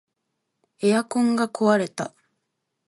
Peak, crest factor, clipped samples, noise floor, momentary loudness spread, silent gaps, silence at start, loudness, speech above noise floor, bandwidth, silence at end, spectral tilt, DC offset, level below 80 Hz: -6 dBFS; 18 dB; under 0.1%; -78 dBFS; 11 LU; none; 0.8 s; -22 LUFS; 57 dB; 11.5 kHz; 0.8 s; -5.5 dB/octave; under 0.1%; -72 dBFS